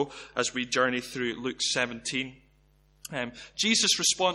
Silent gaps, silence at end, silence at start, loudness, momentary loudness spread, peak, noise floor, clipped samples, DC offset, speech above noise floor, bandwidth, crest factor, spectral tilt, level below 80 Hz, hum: none; 0 s; 0 s; -27 LUFS; 14 LU; -10 dBFS; -63 dBFS; under 0.1%; under 0.1%; 34 dB; 16 kHz; 20 dB; -1.5 dB/octave; -62 dBFS; none